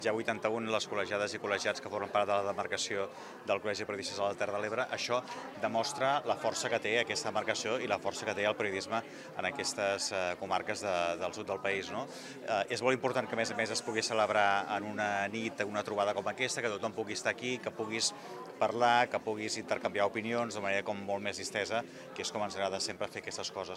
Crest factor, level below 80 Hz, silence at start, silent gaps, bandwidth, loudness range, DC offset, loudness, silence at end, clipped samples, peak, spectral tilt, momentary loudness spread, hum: 22 dB; -76 dBFS; 0 s; none; 15 kHz; 2 LU; under 0.1%; -34 LUFS; 0 s; under 0.1%; -12 dBFS; -3 dB/octave; 7 LU; none